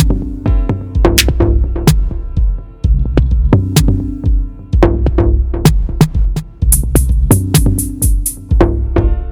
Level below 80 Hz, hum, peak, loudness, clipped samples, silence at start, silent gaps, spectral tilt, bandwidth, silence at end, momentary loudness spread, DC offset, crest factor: -14 dBFS; none; 0 dBFS; -14 LUFS; 0.4%; 0 s; none; -5.5 dB/octave; over 20 kHz; 0 s; 7 LU; under 0.1%; 12 dB